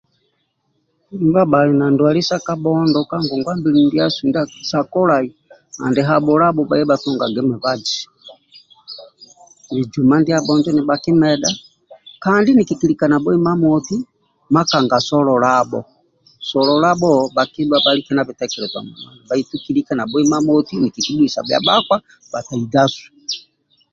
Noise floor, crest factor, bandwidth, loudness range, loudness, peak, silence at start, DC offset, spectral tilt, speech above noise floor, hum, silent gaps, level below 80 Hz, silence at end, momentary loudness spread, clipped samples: -67 dBFS; 16 dB; 7.8 kHz; 3 LU; -16 LUFS; 0 dBFS; 1.1 s; under 0.1%; -5.5 dB/octave; 51 dB; none; none; -56 dBFS; 0.55 s; 12 LU; under 0.1%